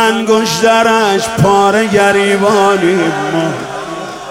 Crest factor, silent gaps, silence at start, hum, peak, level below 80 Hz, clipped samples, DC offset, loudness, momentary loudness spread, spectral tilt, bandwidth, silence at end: 10 dB; none; 0 s; none; 0 dBFS; -44 dBFS; under 0.1%; under 0.1%; -11 LUFS; 12 LU; -4.5 dB/octave; 16.5 kHz; 0 s